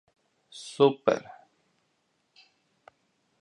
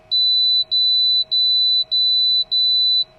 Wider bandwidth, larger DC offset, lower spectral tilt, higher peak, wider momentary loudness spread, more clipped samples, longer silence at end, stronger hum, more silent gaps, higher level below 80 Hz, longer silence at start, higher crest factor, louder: second, 10.5 kHz vs 12.5 kHz; neither; first, -5.5 dB/octave vs -2 dB/octave; first, -8 dBFS vs -12 dBFS; first, 21 LU vs 2 LU; neither; first, 2.2 s vs 0.15 s; neither; neither; second, -78 dBFS vs -60 dBFS; first, 0.55 s vs 0.1 s; first, 24 dB vs 6 dB; second, -25 LUFS vs -14 LUFS